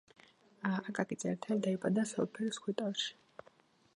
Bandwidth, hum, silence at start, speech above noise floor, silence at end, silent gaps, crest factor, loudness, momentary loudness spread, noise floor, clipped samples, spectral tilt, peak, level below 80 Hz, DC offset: 11 kHz; none; 0.6 s; 31 dB; 0.85 s; none; 22 dB; -37 LUFS; 7 LU; -67 dBFS; under 0.1%; -5 dB/octave; -16 dBFS; -82 dBFS; under 0.1%